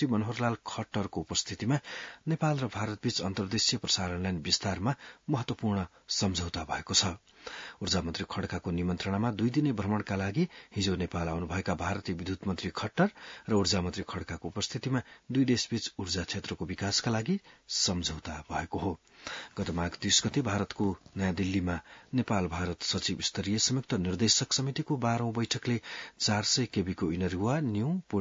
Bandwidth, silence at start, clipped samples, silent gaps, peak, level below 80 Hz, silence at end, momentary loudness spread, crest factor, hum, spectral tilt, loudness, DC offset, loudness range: 7.8 kHz; 0 s; under 0.1%; none; -10 dBFS; -58 dBFS; 0 s; 9 LU; 20 dB; none; -4 dB/octave; -31 LUFS; under 0.1%; 3 LU